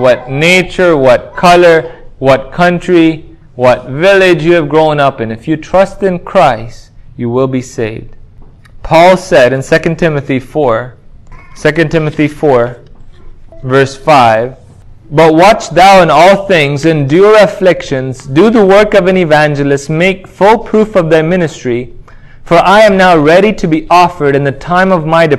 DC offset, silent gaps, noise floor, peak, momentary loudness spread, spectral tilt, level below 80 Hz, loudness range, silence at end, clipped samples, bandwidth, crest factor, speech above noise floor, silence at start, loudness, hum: under 0.1%; none; -34 dBFS; 0 dBFS; 11 LU; -6 dB/octave; -34 dBFS; 6 LU; 0 s; 3%; 16 kHz; 8 dB; 26 dB; 0 s; -8 LUFS; none